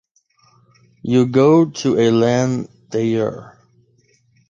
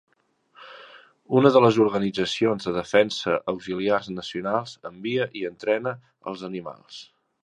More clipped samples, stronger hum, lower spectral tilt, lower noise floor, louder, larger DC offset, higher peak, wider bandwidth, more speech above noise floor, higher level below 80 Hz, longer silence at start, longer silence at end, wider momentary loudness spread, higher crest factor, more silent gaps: neither; neither; about the same, -6.5 dB/octave vs -6 dB/octave; second, -58 dBFS vs -63 dBFS; first, -16 LUFS vs -23 LUFS; neither; about the same, -2 dBFS vs -2 dBFS; second, 7.6 kHz vs 10.5 kHz; first, 43 dB vs 39 dB; about the same, -58 dBFS vs -62 dBFS; first, 1.05 s vs 0.6 s; first, 1 s vs 0.4 s; second, 13 LU vs 20 LU; second, 16 dB vs 22 dB; neither